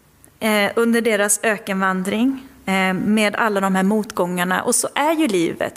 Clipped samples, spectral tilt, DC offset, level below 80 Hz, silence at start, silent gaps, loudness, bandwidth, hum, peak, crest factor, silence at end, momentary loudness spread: under 0.1%; -4 dB/octave; under 0.1%; -58 dBFS; 0.4 s; none; -18 LUFS; 16 kHz; none; -2 dBFS; 16 dB; 0.05 s; 4 LU